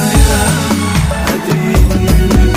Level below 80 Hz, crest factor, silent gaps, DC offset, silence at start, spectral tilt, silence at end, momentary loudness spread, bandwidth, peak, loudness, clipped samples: -14 dBFS; 10 dB; none; under 0.1%; 0 s; -5 dB/octave; 0 s; 4 LU; 16.5 kHz; 0 dBFS; -12 LUFS; under 0.1%